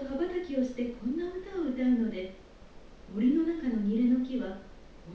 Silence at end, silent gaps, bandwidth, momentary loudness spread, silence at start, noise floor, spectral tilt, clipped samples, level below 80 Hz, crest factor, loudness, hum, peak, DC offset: 0 s; none; 6.6 kHz; 13 LU; 0 s; -50 dBFS; -8 dB/octave; under 0.1%; -54 dBFS; 14 dB; -31 LUFS; none; -16 dBFS; under 0.1%